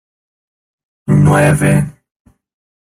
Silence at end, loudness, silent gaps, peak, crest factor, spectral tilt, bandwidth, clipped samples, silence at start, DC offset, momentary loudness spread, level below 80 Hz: 1.05 s; -12 LUFS; none; 0 dBFS; 14 dB; -7 dB/octave; 14.5 kHz; under 0.1%; 1.05 s; under 0.1%; 14 LU; -40 dBFS